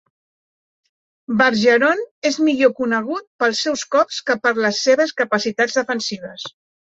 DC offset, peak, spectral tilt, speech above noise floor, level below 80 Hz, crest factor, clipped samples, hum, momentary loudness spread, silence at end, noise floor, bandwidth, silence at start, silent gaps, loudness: under 0.1%; -2 dBFS; -3.5 dB/octave; over 72 dB; -66 dBFS; 18 dB; under 0.1%; none; 11 LU; 0.35 s; under -90 dBFS; 8 kHz; 1.3 s; 2.11-2.22 s, 3.27-3.39 s; -18 LUFS